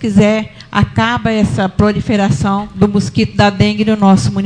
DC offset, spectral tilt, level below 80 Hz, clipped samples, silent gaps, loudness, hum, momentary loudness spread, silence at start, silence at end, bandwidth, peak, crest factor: under 0.1%; -6.5 dB/octave; -34 dBFS; under 0.1%; none; -13 LUFS; none; 5 LU; 0 s; 0 s; 10 kHz; 0 dBFS; 12 dB